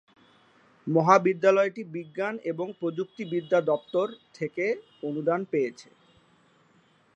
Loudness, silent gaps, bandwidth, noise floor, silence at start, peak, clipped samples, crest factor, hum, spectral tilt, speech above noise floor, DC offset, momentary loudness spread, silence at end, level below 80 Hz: -27 LUFS; none; 8.2 kHz; -63 dBFS; 0.85 s; -4 dBFS; under 0.1%; 24 dB; none; -6.5 dB/octave; 36 dB; under 0.1%; 14 LU; 1.35 s; -78 dBFS